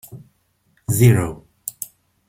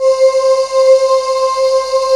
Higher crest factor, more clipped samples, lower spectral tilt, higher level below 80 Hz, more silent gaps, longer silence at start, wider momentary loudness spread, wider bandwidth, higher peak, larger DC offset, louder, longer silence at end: first, 20 dB vs 10 dB; neither; first, -6.5 dB/octave vs 0.5 dB/octave; about the same, -48 dBFS vs -50 dBFS; neither; about the same, 0.1 s vs 0 s; first, 19 LU vs 4 LU; first, 16.5 kHz vs 11.5 kHz; about the same, -2 dBFS vs 0 dBFS; neither; second, -18 LUFS vs -11 LUFS; first, 0.45 s vs 0 s